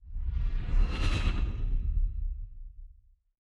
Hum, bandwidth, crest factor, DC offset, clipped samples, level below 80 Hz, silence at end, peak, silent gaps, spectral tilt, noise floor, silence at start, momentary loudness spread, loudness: none; 7.6 kHz; 14 dB; under 0.1%; under 0.1%; -30 dBFS; 0.65 s; -16 dBFS; none; -6 dB/octave; -58 dBFS; 0 s; 15 LU; -34 LUFS